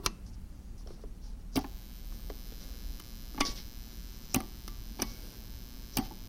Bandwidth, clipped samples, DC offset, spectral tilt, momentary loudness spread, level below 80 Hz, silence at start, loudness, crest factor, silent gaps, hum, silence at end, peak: 17 kHz; under 0.1%; under 0.1%; -3.5 dB/octave; 14 LU; -44 dBFS; 0 s; -40 LUFS; 30 dB; none; none; 0 s; -8 dBFS